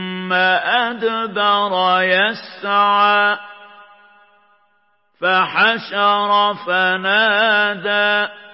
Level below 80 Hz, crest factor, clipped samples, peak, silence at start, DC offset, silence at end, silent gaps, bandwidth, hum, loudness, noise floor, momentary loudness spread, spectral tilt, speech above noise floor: -82 dBFS; 16 dB; under 0.1%; -2 dBFS; 0 s; under 0.1%; 0.05 s; none; 5.8 kHz; none; -16 LUFS; -62 dBFS; 6 LU; -8 dB/octave; 46 dB